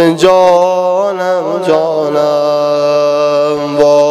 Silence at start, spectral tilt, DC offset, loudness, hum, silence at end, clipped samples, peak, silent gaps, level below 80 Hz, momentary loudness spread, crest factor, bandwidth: 0 s; -5.5 dB/octave; under 0.1%; -11 LUFS; none; 0 s; 0.2%; 0 dBFS; none; -52 dBFS; 6 LU; 10 dB; 12.5 kHz